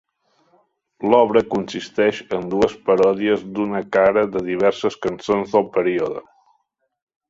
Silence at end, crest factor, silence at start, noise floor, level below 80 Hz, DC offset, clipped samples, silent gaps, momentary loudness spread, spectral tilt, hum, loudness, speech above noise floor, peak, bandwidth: 1.1 s; 20 dB; 1 s; -69 dBFS; -56 dBFS; under 0.1%; under 0.1%; none; 9 LU; -6 dB/octave; none; -19 LUFS; 51 dB; 0 dBFS; 7.8 kHz